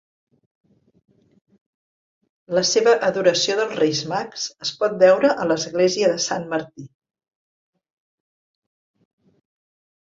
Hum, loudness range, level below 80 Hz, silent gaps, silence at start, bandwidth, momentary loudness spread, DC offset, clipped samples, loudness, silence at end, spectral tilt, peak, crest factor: none; 8 LU; -68 dBFS; none; 2.5 s; 7.8 kHz; 11 LU; under 0.1%; under 0.1%; -20 LUFS; 3.3 s; -3 dB/octave; -2 dBFS; 20 dB